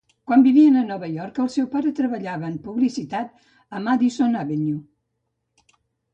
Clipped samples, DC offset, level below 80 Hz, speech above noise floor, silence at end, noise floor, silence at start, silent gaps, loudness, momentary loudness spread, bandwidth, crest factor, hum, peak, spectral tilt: under 0.1%; under 0.1%; -66 dBFS; 56 dB; 1.3 s; -76 dBFS; 0.3 s; none; -21 LUFS; 15 LU; 8.4 kHz; 16 dB; none; -4 dBFS; -7 dB/octave